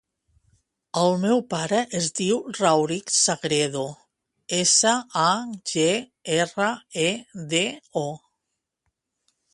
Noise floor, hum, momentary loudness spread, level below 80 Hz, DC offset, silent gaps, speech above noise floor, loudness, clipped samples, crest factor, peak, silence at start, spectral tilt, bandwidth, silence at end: -81 dBFS; none; 10 LU; -68 dBFS; under 0.1%; none; 58 dB; -23 LUFS; under 0.1%; 20 dB; -4 dBFS; 0.95 s; -3 dB/octave; 11.5 kHz; 1.35 s